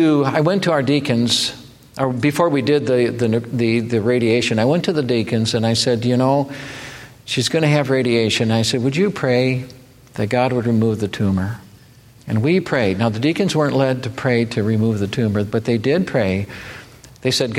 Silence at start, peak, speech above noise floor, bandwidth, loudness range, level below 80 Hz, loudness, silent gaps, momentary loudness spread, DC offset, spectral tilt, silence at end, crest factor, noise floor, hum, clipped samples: 0 s; -2 dBFS; 29 dB; 15.5 kHz; 2 LU; -52 dBFS; -18 LUFS; none; 10 LU; under 0.1%; -5.5 dB/octave; 0 s; 16 dB; -46 dBFS; none; under 0.1%